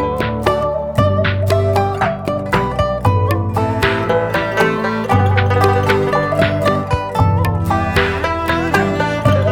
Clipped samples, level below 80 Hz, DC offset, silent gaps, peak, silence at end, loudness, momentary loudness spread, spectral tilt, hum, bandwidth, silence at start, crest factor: under 0.1%; -32 dBFS; under 0.1%; none; 0 dBFS; 0 s; -16 LUFS; 4 LU; -6.5 dB/octave; none; 16 kHz; 0 s; 14 dB